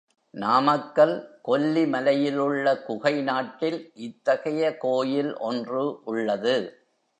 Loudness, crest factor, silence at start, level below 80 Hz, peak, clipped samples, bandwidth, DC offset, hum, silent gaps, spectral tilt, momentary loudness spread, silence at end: -25 LUFS; 18 dB; 0.35 s; -80 dBFS; -6 dBFS; under 0.1%; 9.6 kHz; under 0.1%; none; none; -6 dB/octave; 8 LU; 0.5 s